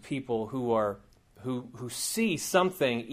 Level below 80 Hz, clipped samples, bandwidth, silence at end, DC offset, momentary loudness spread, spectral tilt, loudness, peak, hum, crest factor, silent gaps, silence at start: -64 dBFS; under 0.1%; 15.5 kHz; 0 s; under 0.1%; 11 LU; -4 dB/octave; -30 LUFS; -10 dBFS; none; 20 dB; none; 0.05 s